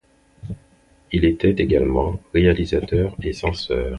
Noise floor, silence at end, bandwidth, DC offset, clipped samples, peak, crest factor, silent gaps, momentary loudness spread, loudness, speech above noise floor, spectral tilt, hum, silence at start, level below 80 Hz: -55 dBFS; 0 s; 11 kHz; under 0.1%; under 0.1%; -4 dBFS; 16 dB; none; 18 LU; -20 LUFS; 36 dB; -7.5 dB/octave; none; 0.45 s; -32 dBFS